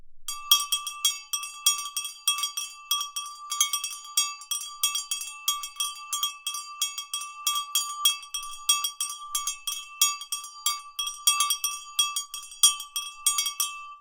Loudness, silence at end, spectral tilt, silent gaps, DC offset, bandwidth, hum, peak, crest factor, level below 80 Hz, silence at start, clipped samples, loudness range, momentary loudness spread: -26 LUFS; 0 s; 7.5 dB/octave; none; under 0.1%; 19 kHz; none; -2 dBFS; 28 dB; -64 dBFS; 0 s; under 0.1%; 4 LU; 11 LU